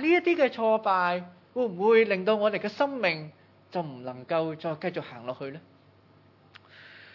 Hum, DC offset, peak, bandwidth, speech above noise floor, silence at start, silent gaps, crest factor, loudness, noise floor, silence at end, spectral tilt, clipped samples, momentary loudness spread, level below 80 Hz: none; under 0.1%; -10 dBFS; 6 kHz; 32 dB; 0 s; none; 18 dB; -27 LUFS; -58 dBFS; 0.15 s; -7 dB/octave; under 0.1%; 16 LU; -84 dBFS